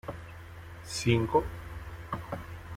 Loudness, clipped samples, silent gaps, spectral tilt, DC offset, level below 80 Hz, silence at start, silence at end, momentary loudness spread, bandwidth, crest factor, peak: -32 LUFS; under 0.1%; none; -5.5 dB/octave; under 0.1%; -48 dBFS; 0.05 s; 0 s; 20 LU; 16 kHz; 22 dB; -10 dBFS